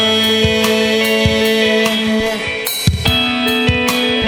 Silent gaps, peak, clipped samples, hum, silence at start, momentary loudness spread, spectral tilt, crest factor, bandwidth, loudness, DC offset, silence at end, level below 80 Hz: none; 0 dBFS; under 0.1%; none; 0 s; 4 LU; -4 dB/octave; 14 dB; 17.5 kHz; -13 LUFS; under 0.1%; 0 s; -32 dBFS